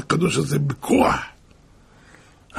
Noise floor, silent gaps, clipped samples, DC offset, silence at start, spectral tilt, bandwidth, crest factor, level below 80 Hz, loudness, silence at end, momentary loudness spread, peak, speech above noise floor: -51 dBFS; none; under 0.1%; under 0.1%; 0 s; -5.5 dB/octave; 15.5 kHz; 20 dB; -46 dBFS; -21 LUFS; 0 s; 8 LU; -4 dBFS; 31 dB